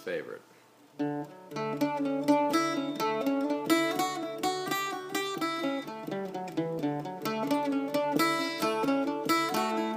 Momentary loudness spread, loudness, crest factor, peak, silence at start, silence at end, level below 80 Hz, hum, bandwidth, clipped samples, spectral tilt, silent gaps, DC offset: 9 LU; -30 LUFS; 20 dB; -12 dBFS; 0 s; 0 s; -76 dBFS; none; 15.5 kHz; under 0.1%; -4 dB/octave; none; under 0.1%